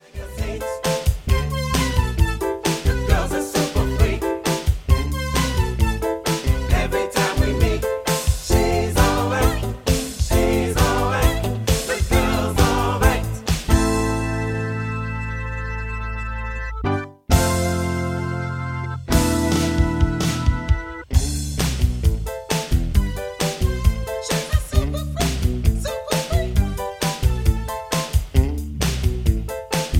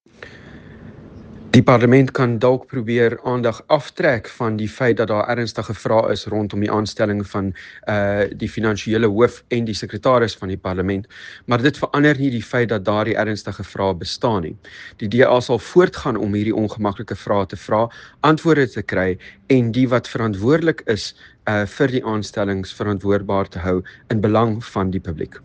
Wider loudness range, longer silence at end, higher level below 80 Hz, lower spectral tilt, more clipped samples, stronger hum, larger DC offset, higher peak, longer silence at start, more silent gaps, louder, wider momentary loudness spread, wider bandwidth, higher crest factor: about the same, 4 LU vs 4 LU; about the same, 0 s vs 0.05 s; first, -24 dBFS vs -50 dBFS; second, -5 dB/octave vs -6.5 dB/octave; neither; neither; neither; about the same, -2 dBFS vs 0 dBFS; about the same, 0.15 s vs 0.2 s; neither; about the same, -21 LUFS vs -19 LUFS; about the same, 8 LU vs 9 LU; first, 16.5 kHz vs 9.4 kHz; about the same, 18 dB vs 18 dB